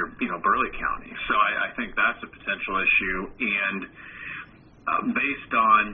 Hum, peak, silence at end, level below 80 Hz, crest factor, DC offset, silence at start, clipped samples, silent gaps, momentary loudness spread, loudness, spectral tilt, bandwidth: none; -6 dBFS; 0 s; -50 dBFS; 18 dB; under 0.1%; 0 s; under 0.1%; none; 15 LU; -24 LUFS; -1.5 dB/octave; 3.8 kHz